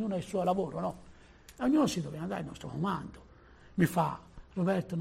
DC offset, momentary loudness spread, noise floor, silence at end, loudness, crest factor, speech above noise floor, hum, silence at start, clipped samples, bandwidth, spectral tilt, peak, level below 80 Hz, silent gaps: under 0.1%; 12 LU; -56 dBFS; 0 s; -33 LUFS; 20 dB; 24 dB; none; 0 s; under 0.1%; 14.5 kHz; -6.5 dB/octave; -14 dBFS; -58 dBFS; none